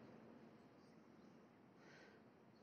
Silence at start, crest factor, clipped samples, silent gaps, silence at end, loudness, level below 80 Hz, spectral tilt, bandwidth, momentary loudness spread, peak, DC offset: 0 s; 14 dB; under 0.1%; none; 0 s; -66 LUFS; under -90 dBFS; -5 dB/octave; 6.8 kHz; 4 LU; -52 dBFS; under 0.1%